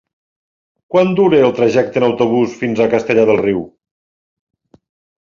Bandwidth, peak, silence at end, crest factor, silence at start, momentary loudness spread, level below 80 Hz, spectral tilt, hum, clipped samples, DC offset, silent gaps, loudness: 7.4 kHz; 0 dBFS; 1.55 s; 16 dB; 0.9 s; 6 LU; -54 dBFS; -7 dB/octave; none; under 0.1%; under 0.1%; none; -14 LUFS